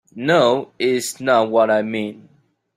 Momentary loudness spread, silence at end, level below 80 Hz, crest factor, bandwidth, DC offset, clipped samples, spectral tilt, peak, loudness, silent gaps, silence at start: 9 LU; 0.6 s; -66 dBFS; 16 dB; 16 kHz; under 0.1%; under 0.1%; -4.5 dB/octave; -2 dBFS; -18 LUFS; none; 0.15 s